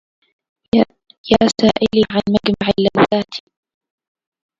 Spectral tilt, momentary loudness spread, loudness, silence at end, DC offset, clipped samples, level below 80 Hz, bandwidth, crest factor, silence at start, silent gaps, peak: -5.5 dB/octave; 8 LU; -16 LUFS; 1.2 s; under 0.1%; under 0.1%; -44 dBFS; 7.8 kHz; 18 dB; 0.75 s; 1.18-1.24 s; 0 dBFS